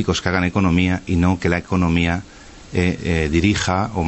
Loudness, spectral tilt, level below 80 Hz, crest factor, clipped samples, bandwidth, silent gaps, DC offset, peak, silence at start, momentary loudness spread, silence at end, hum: -19 LUFS; -6 dB/octave; -34 dBFS; 14 dB; under 0.1%; 8.4 kHz; none; under 0.1%; -4 dBFS; 0 s; 4 LU; 0 s; none